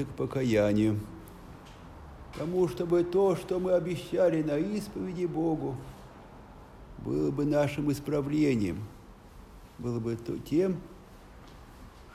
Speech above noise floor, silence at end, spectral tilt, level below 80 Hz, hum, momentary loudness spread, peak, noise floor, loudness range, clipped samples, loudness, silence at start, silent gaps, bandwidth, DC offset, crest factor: 22 dB; 0 s; -7.5 dB/octave; -52 dBFS; none; 23 LU; -14 dBFS; -50 dBFS; 4 LU; under 0.1%; -29 LUFS; 0 s; none; 15.5 kHz; under 0.1%; 16 dB